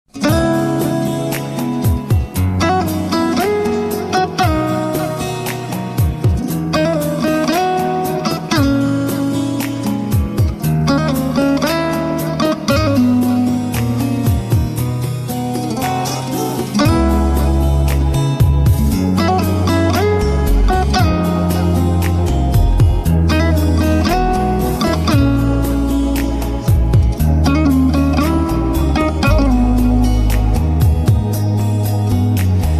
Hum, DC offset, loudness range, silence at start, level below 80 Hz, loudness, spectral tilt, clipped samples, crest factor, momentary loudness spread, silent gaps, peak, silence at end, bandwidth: none; under 0.1%; 3 LU; 0.15 s; -20 dBFS; -15 LUFS; -6.5 dB/octave; under 0.1%; 12 dB; 6 LU; none; -2 dBFS; 0 s; 14 kHz